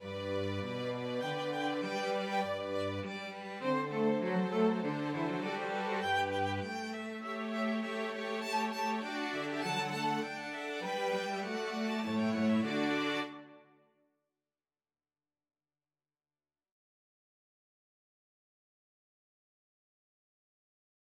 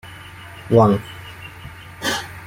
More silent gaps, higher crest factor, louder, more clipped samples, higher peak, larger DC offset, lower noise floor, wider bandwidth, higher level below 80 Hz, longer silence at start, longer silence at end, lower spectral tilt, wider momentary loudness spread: neither; about the same, 16 dB vs 20 dB; second, -35 LUFS vs -18 LUFS; neither; second, -20 dBFS vs -2 dBFS; neither; first, under -90 dBFS vs -38 dBFS; about the same, 15 kHz vs 16.5 kHz; second, -88 dBFS vs -48 dBFS; about the same, 0 s vs 0.05 s; first, 7.55 s vs 0 s; about the same, -5.5 dB/octave vs -6 dB/octave; second, 7 LU vs 23 LU